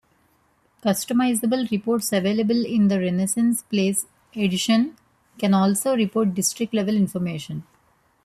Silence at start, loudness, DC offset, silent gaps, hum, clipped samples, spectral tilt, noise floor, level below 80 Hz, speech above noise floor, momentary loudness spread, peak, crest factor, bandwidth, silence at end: 0.85 s; -22 LUFS; under 0.1%; none; none; under 0.1%; -5 dB/octave; -63 dBFS; -62 dBFS; 42 dB; 8 LU; -8 dBFS; 14 dB; 14.5 kHz; 0.65 s